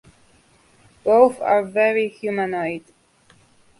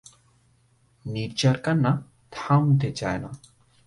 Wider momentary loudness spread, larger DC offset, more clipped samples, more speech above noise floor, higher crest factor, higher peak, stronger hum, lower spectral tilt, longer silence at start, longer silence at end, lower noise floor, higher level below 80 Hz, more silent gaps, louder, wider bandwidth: second, 12 LU vs 20 LU; neither; neither; about the same, 37 dB vs 39 dB; about the same, 20 dB vs 18 dB; first, -2 dBFS vs -8 dBFS; neither; about the same, -6 dB/octave vs -6.5 dB/octave; about the same, 1.05 s vs 1.05 s; first, 1 s vs 0.5 s; second, -56 dBFS vs -63 dBFS; second, -64 dBFS vs -54 dBFS; neither; first, -19 LUFS vs -24 LUFS; about the same, 11.5 kHz vs 11.5 kHz